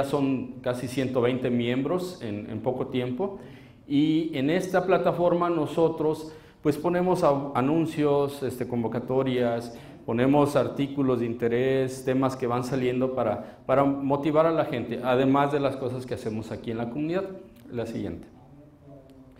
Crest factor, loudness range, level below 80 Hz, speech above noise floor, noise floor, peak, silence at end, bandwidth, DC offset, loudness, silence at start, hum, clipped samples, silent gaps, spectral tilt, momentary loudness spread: 18 dB; 4 LU; -58 dBFS; 25 dB; -51 dBFS; -8 dBFS; 0.15 s; 16 kHz; under 0.1%; -26 LUFS; 0 s; none; under 0.1%; none; -7 dB/octave; 11 LU